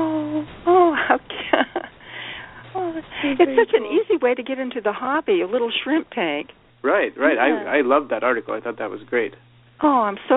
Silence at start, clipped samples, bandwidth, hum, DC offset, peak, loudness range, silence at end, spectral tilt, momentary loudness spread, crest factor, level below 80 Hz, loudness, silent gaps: 0 s; under 0.1%; 4 kHz; none; under 0.1%; -2 dBFS; 2 LU; 0 s; -2 dB/octave; 13 LU; 20 dB; -60 dBFS; -21 LUFS; none